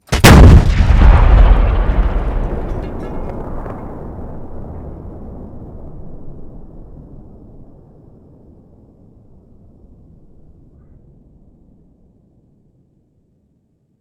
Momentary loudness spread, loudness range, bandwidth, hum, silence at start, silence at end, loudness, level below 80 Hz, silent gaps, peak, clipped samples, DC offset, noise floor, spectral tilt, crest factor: 28 LU; 27 LU; 18.5 kHz; none; 0.1 s; 7.2 s; -12 LUFS; -16 dBFS; none; 0 dBFS; 1%; under 0.1%; -60 dBFS; -6 dB/octave; 14 dB